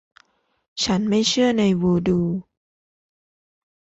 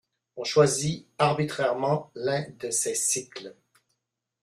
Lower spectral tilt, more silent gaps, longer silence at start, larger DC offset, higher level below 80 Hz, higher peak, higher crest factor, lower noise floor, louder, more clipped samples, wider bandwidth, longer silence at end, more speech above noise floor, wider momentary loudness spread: first, -5 dB/octave vs -3.5 dB/octave; neither; first, 0.75 s vs 0.35 s; neither; first, -52 dBFS vs -64 dBFS; about the same, -8 dBFS vs -6 dBFS; second, 14 dB vs 22 dB; second, -62 dBFS vs -81 dBFS; first, -20 LUFS vs -26 LUFS; neither; second, 8.2 kHz vs 15.5 kHz; first, 1.55 s vs 0.9 s; second, 43 dB vs 55 dB; second, 9 LU vs 16 LU